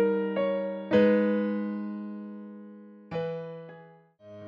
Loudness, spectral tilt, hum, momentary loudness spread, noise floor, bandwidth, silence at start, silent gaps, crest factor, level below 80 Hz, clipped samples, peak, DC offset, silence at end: -28 LUFS; -9 dB/octave; none; 22 LU; -53 dBFS; 5.6 kHz; 0 s; none; 18 dB; -72 dBFS; under 0.1%; -10 dBFS; under 0.1%; 0 s